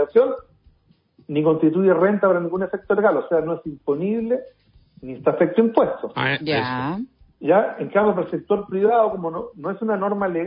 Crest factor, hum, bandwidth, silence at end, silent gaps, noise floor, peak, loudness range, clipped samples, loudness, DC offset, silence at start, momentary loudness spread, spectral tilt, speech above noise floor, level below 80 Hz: 16 dB; none; 5.4 kHz; 0 s; none; -59 dBFS; -4 dBFS; 2 LU; under 0.1%; -21 LUFS; under 0.1%; 0 s; 10 LU; -11.5 dB/octave; 39 dB; -58 dBFS